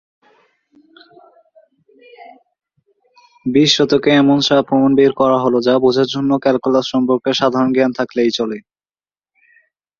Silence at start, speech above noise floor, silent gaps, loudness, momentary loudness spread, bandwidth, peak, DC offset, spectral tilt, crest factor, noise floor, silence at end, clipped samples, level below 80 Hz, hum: 2.2 s; over 76 dB; none; -14 LUFS; 5 LU; 7.4 kHz; -2 dBFS; under 0.1%; -5 dB/octave; 16 dB; under -90 dBFS; 1.4 s; under 0.1%; -58 dBFS; none